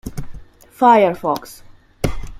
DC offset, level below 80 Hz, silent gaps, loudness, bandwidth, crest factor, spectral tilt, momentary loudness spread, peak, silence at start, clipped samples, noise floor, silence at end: under 0.1%; -34 dBFS; none; -16 LUFS; 16 kHz; 18 dB; -6 dB/octave; 18 LU; -2 dBFS; 0.05 s; under 0.1%; -35 dBFS; 0.05 s